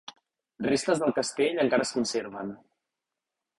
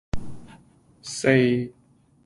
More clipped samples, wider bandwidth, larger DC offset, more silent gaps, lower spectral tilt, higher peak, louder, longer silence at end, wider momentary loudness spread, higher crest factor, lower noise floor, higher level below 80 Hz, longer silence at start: neither; about the same, 11.5 kHz vs 11.5 kHz; neither; neither; second, -4 dB/octave vs -5.5 dB/octave; second, -10 dBFS vs -4 dBFS; second, -27 LUFS vs -22 LUFS; first, 1.05 s vs 0.55 s; second, 13 LU vs 21 LU; about the same, 18 dB vs 22 dB; first, -87 dBFS vs -54 dBFS; second, -68 dBFS vs -46 dBFS; about the same, 0.1 s vs 0.15 s